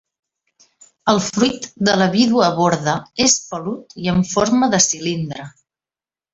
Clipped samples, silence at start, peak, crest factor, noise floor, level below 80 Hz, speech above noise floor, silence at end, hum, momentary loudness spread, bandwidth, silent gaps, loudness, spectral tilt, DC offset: under 0.1%; 1.05 s; -2 dBFS; 18 dB; under -90 dBFS; -52 dBFS; over 73 dB; 0.85 s; none; 11 LU; 8 kHz; none; -17 LUFS; -3.5 dB/octave; under 0.1%